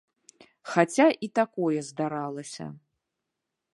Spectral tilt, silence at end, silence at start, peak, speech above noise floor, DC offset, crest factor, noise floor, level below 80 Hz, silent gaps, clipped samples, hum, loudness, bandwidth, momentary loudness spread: -5.5 dB/octave; 1 s; 0.65 s; -6 dBFS; 58 dB; under 0.1%; 24 dB; -84 dBFS; -78 dBFS; none; under 0.1%; none; -26 LUFS; 11.5 kHz; 18 LU